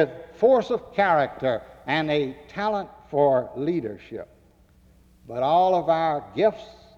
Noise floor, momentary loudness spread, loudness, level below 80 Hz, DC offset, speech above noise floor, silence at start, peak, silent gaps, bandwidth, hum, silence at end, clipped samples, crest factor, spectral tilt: -56 dBFS; 12 LU; -23 LUFS; -58 dBFS; under 0.1%; 33 dB; 0 s; -8 dBFS; none; 7.6 kHz; none; 0.25 s; under 0.1%; 16 dB; -7 dB/octave